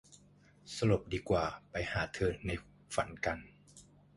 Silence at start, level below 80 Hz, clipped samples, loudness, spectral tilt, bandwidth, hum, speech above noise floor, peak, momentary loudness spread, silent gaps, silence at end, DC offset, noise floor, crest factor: 0.1 s; -52 dBFS; under 0.1%; -36 LUFS; -5.5 dB/octave; 11.5 kHz; none; 28 dB; -16 dBFS; 11 LU; none; 0.35 s; under 0.1%; -63 dBFS; 20 dB